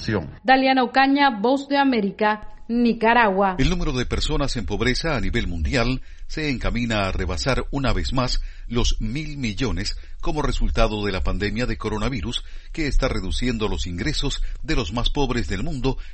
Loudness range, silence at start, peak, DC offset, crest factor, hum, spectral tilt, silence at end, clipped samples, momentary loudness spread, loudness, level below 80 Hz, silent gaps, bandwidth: 6 LU; 0 s; -2 dBFS; under 0.1%; 20 dB; none; -5 dB/octave; 0 s; under 0.1%; 11 LU; -23 LUFS; -26 dBFS; none; 8.8 kHz